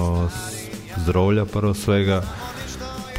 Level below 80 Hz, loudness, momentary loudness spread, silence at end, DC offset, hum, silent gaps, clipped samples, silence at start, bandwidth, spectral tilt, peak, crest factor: -36 dBFS; -23 LUFS; 12 LU; 0 s; under 0.1%; none; none; under 0.1%; 0 s; 16 kHz; -6 dB/octave; -8 dBFS; 14 dB